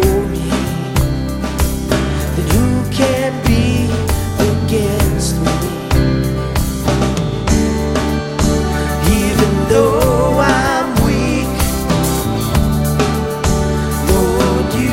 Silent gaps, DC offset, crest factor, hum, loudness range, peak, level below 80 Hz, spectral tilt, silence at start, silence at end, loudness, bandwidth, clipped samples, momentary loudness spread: none; under 0.1%; 14 dB; none; 2 LU; 0 dBFS; -22 dBFS; -5.5 dB/octave; 0 s; 0 s; -15 LUFS; 16.5 kHz; under 0.1%; 5 LU